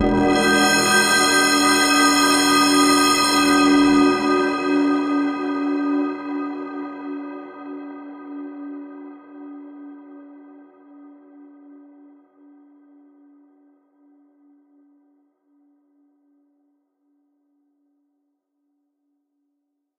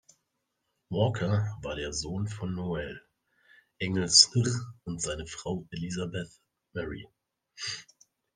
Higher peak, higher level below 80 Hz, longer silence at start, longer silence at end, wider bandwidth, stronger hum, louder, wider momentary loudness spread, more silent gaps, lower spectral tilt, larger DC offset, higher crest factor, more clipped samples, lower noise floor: about the same, -4 dBFS vs -4 dBFS; first, -50 dBFS vs -56 dBFS; second, 0 s vs 0.9 s; first, 9.6 s vs 0.5 s; first, 15.5 kHz vs 10 kHz; neither; first, -17 LUFS vs -29 LUFS; first, 23 LU vs 19 LU; neither; about the same, -2.5 dB/octave vs -3.5 dB/octave; neither; second, 18 dB vs 28 dB; neither; second, -75 dBFS vs -81 dBFS